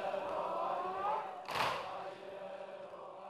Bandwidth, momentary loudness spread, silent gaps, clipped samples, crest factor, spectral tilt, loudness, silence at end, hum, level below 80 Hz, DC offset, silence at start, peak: 14 kHz; 11 LU; none; under 0.1%; 20 dB; -3.5 dB/octave; -40 LUFS; 0 s; none; -76 dBFS; under 0.1%; 0 s; -20 dBFS